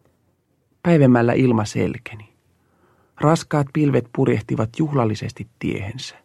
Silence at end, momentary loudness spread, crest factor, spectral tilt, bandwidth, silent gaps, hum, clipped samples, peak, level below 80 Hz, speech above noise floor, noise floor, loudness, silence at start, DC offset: 0.15 s; 13 LU; 20 dB; -7.5 dB/octave; 12 kHz; none; none; under 0.1%; -2 dBFS; -54 dBFS; 46 dB; -65 dBFS; -20 LUFS; 0.85 s; under 0.1%